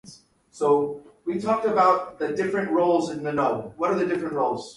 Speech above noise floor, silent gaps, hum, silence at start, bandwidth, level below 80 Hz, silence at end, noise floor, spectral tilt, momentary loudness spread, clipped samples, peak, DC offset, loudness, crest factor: 27 dB; none; none; 0.05 s; 11.5 kHz; -64 dBFS; 0.05 s; -50 dBFS; -6 dB/octave; 9 LU; under 0.1%; -8 dBFS; under 0.1%; -24 LUFS; 16 dB